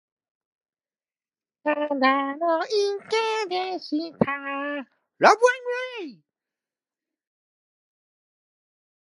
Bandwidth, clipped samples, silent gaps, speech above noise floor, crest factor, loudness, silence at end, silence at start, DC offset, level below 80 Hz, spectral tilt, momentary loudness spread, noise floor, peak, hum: 11.5 kHz; under 0.1%; none; over 66 dB; 26 dB; -24 LUFS; 3 s; 1.65 s; under 0.1%; -66 dBFS; -4 dB/octave; 12 LU; under -90 dBFS; 0 dBFS; none